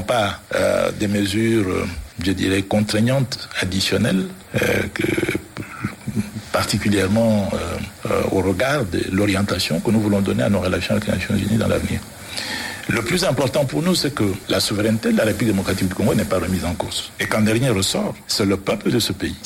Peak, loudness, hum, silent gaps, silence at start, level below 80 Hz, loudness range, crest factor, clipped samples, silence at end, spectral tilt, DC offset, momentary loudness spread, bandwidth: -4 dBFS; -20 LUFS; none; none; 0 s; -42 dBFS; 2 LU; 16 dB; under 0.1%; 0 s; -5 dB/octave; under 0.1%; 7 LU; 17 kHz